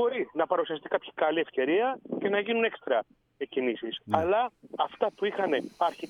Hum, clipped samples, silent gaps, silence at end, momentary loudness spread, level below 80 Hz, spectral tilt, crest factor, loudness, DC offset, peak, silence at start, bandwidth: none; under 0.1%; none; 0 s; 6 LU; -68 dBFS; -6 dB/octave; 18 dB; -29 LUFS; under 0.1%; -10 dBFS; 0 s; 10.5 kHz